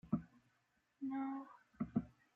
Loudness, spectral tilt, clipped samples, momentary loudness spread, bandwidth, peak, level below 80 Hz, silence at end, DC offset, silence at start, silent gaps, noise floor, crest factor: -45 LUFS; -9.5 dB/octave; under 0.1%; 12 LU; 3.9 kHz; -24 dBFS; -70 dBFS; 0.25 s; under 0.1%; 0.05 s; none; -81 dBFS; 20 dB